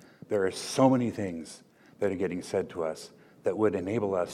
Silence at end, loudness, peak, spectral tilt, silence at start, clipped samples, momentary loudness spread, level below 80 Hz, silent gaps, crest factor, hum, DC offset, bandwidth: 0 s; -29 LUFS; -10 dBFS; -6 dB/octave; 0.3 s; under 0.1%; 17 LU; -72 dBFS; none; 20 dB; none; under 0.1%; 14 kHz